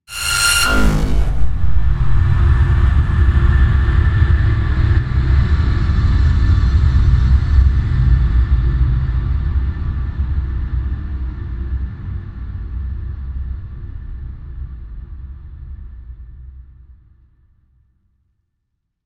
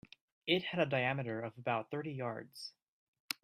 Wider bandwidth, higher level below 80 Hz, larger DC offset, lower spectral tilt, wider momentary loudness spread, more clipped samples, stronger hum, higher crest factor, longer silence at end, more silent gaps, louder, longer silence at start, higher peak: about the same, 15 kHz vs 15.5 kHz; first, -18 dBFS vs -78 dBFS; neither; about the same, -5 dB/octave vs -5 dB/octave; first, 18 LU vs 14 LU; neither; neither; second, 14 dB vs 24 dB; first, 2.45 s vs 0.1 s; second, none vs 2.82-3.13 s, 3.20-3.28 s; first, -17 LUFS vs -37 LUFS; second, 0.1 s vs 0.45 s; first, 0 dBFS vs -14 dBFS